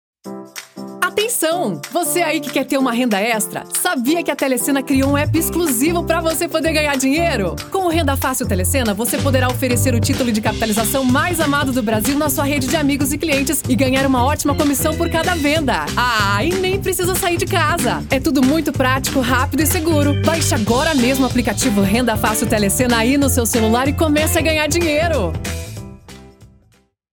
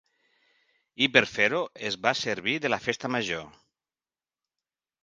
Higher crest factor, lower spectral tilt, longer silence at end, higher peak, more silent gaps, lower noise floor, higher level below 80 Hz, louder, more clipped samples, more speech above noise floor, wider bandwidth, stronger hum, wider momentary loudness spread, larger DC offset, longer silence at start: second, 16 dB vs 28 dB; about the same, -4.5 dB/octave vs -3.5 dB/octave; second, 0.7 s vs 1.55 s; about the same, -2 dBFS vs -2 dBFS; neither; second, -56 dBFS vs under -90 dBFS; first, -34 dBFS vs -68 dBFS; first, -16 LUFS vs -26 LUFS; neither; second, 40 dB vs over 63 dB; first, over 20 kHz vs 9.8 kHz; neither; second, 4 LU vs 9 LU; neither; second, 0.25 s vs 1 s